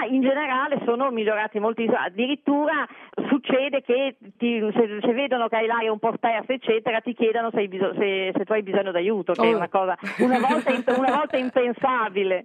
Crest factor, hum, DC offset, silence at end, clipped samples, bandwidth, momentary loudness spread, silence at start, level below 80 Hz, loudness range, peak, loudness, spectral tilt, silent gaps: 18 dB; none; under 0.1%; 0 s; under 0.1%; 10 kHz; 4 LU; 0 s; -78 dBFS; 2 LU; -6 dBFS; -23 LUFS; -6 dB/octave; none